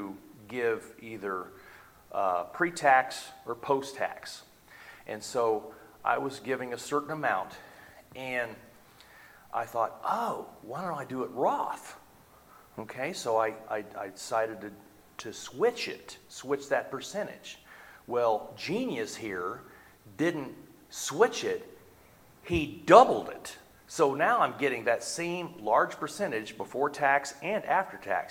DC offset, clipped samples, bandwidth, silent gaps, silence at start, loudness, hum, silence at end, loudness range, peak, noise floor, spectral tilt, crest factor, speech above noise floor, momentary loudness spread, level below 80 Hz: under 0.1%; under 0.1%; 17.5 kHz; none; 0 s; -30 LUFS; none; 0 s; 9 LU; -4 dBFS; -58 dBFS; -4 dB/octave; 26 dB; 28 dB; 18 LU; -62 dBFS